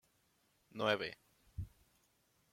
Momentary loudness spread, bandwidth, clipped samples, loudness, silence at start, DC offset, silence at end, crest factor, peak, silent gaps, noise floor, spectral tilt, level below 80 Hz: 19 LU; 16.5 kHz; under 0.1%; -40 LUFS; 0.75 s; under 0.1%; 0.85 s; 26 dB; -18 dBFS; none; -77 dBFS; -5 dB/octave; -64 dBFS